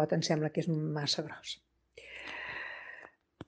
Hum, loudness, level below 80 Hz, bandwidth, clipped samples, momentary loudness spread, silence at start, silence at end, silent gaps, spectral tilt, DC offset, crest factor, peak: none; -35 LUFS; -72 dBFS; 9.8 kHz; under 0.1%; 17 LU; 0 s; 0.05 s; none; -5 dB/octave; under 0.1%; 20 dB; -16 dBFS